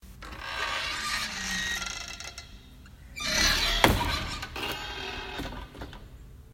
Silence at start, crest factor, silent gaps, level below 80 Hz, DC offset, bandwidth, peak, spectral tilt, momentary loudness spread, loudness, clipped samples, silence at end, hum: 0.05 s; 30 dB; none; -42 dBFS; under 0.1%; 16.5 kHz; -2 dBFS; -2.5 dB/octave; 21 LU; -29 LUFS; under 0.1%; 0 s; none